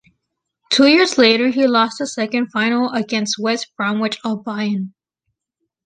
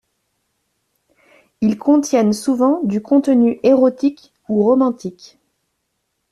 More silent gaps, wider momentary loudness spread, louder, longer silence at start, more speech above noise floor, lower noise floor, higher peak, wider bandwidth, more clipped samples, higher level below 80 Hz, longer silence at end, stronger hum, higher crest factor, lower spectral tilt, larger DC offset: neither; first, 11 LU vs 8 LU; about the same, -17 LUFS vs -16 LUFS; second, 0.7 s vs 1.6 s; about the same, 60 dB vs 57 dB; first, -77 dBFS vs -72 dBFS; about the same, -2 dBFS vs -4 dBFS; second, 9.6 kHz vs 12.5 kHz; neither; second, -66 dBFS vs -60 dBFS; second, 0.95 s vs 1.2 s; neither; about the same, 16 dB vs 14 dB; second, -3.5 dB/octave vs -6.5 dB/octave; neither